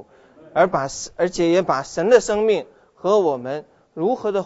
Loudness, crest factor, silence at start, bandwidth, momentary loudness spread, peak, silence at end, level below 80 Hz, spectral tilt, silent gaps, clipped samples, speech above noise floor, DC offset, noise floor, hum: -20 LUFS; 18 dB; 0.55 s; 8 kHz; 11 LU; -2 dBFS; 0 s; -54 dBFS; -5 dB/octave; none; under 0.1%; 29 dB; under 0.1%; -48 dBFS; none